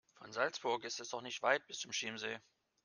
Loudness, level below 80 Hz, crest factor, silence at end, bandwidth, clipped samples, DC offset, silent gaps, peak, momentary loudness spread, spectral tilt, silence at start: -39 LUFS; -88 dBFS; 26 dB; 0.45 s; 10.5 kHz; under 0.1%; under 0.1%; none; -16 dBFS; 9 LU; -1.5 dB/octave; 0.2 s